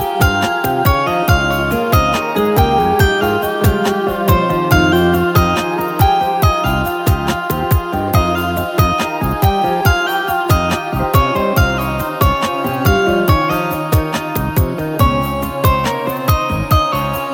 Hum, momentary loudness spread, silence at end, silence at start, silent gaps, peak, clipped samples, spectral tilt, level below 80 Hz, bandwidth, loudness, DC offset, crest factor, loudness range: none; 5 LU; 0 s; 0 s; none; 0 dBFS; under 0.1%; -6 dB/octave; -24 dBFS; 17 kHz; -15 LUFS; under 0.1%; 14 dB; 2 LU